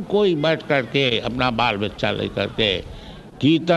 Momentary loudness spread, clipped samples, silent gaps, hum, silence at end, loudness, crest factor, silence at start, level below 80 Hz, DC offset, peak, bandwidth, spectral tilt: 7 LU; under 0.1%; none; none; 0 s; -20 LUFS; 18 dB; 0 s; -44 dBFS; under 0.1%; -4 dBFS; 12 kHz; -6 dB/octave